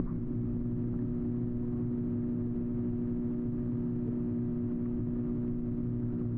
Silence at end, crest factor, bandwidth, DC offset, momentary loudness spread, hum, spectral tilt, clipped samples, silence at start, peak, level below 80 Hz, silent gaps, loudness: 0 s; 14 dB; 2.6 kHz; under 0.1%; 1 LU; none; -13 dB/octave; under 0.1%; 0 s; -18 dBFS; -46 dBFS; none; -34 LUFS